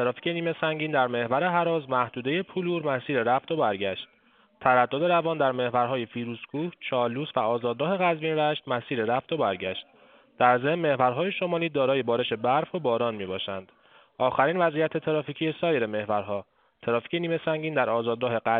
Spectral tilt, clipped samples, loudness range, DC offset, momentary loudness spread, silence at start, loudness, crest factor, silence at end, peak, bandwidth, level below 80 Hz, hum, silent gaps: -3.5 dB/octave; under 0.1%; 2 LU; under 0.1%; 8 LU; 0 s; -26 LUFS; 20 dB; 0 s; -6 dBFS; 4.5 kHz; -70 dBFS; none; none